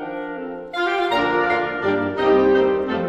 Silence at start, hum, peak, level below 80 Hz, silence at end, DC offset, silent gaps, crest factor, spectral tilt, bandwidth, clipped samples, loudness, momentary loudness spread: 0 s; none; -6 dBFS; -50 dBFS; 0 s; under 0.1%; none; 14 dB; -6.5 dB/octave; 7.8 kHz; under 0.1%; -20 LUFS; 13 LU